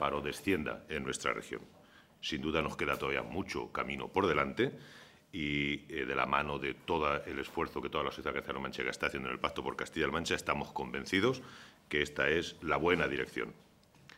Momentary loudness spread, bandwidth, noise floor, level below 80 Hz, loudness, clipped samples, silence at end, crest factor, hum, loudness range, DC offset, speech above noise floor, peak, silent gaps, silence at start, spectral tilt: 8 LU; 16 kHz; -60 dBFS; -56 dBFS; -35 LUFS; under 0.1%; 0 s; 24 dB; none; 3 LU; under 0.1%; 25 dB; -12 dBFS; none; 0 s; -4.5 dB/octave